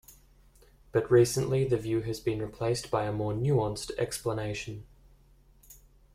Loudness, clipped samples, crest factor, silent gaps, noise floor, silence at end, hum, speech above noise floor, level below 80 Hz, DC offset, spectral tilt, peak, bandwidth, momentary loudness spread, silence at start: -29 LUFS; under 0.1%; 20 dB; none; -60 dBFS; 0.4 s; none; 31 dB; -54 dBFS; under 0.1%; -6 dB/octave; -10 dBFS; 16 kHz; 10 LU; 0.1 s